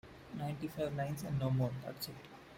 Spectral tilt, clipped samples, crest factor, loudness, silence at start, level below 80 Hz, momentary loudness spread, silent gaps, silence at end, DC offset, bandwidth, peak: -6.5 dB/octave; under 0.1%; 16 dB; -39 LUFS; 0.05 s; -64 dBFS; 10 LU; none; 0 s; under 0.1%; 16.5 kHz; -24 dBFS